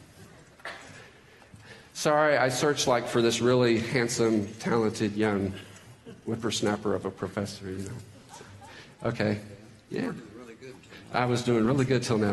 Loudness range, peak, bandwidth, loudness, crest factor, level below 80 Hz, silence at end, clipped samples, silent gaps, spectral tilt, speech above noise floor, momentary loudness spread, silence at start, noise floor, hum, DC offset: 10 LU; -10 dBFS; 12 kHz; -27 LUFS; 18 dB; -62 dBFS; 0 s; under 0.1%; none; -5 dB/octave; 27 dB; 23 LU; 0 s; -53 dBFS; none; under 0.1%